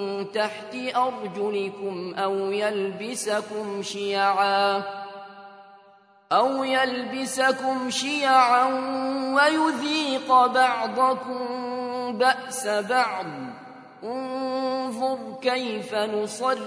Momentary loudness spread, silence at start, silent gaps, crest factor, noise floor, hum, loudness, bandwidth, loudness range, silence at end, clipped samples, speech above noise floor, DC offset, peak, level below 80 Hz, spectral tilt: 12 LU; 0 s; none; 20 dB; -55 dBFS; none; -24 LUFS; 11 kHz; 6 LU; 0 s; under 0.1%; 31 dB; under 0.1%; -6 dBFS; -80 dBFS; -3 dB/octave